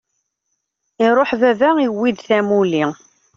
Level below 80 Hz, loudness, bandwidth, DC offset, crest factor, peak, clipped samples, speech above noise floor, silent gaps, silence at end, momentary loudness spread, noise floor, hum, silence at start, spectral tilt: -62 dBFS; -16 LUFS; 7.4 kHz; under 0.1%; 16 dB; -2 dBFS; under 0.1%; 59 dB; none; 0.45 s; 6 LU; -74 dBFS; none; 1 s; -4 dB/octave